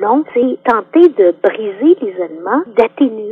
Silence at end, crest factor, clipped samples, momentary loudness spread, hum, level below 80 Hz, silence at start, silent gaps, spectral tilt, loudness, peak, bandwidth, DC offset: 0 s; 12 dB; 0.2%; 7 LU; none; -58 dBFS; 0 s; none; -7.5 dB/octave; -13 LUFS; 0 dBFS; 4.5 kHz; under 0.1%